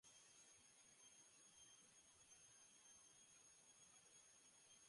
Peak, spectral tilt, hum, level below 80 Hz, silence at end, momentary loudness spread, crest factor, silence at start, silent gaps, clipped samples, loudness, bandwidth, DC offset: -56 dBFS; 0 dB/octave; none; under -90 dBFS; 0 s; 2 LU; 14 dB; 0.05 s; none; under 0.1%; -67 LUFS; 11.5 kHz; under 0.1%